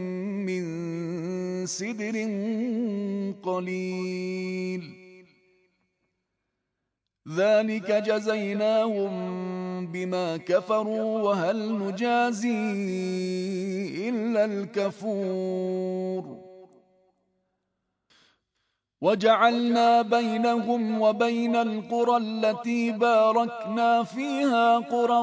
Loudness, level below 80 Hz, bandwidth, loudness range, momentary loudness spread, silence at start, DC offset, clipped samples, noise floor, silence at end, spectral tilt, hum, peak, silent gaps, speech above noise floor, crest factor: -26 LUFS; -80 dBFS; 8 kHz; 10 LU; 10 LU; 0 s; under 0.1%; under 0.1%; -83 dBFS; 0 s; -5.5 dB/octave; none; -8 dBFS; none; 58 dB; 20 dB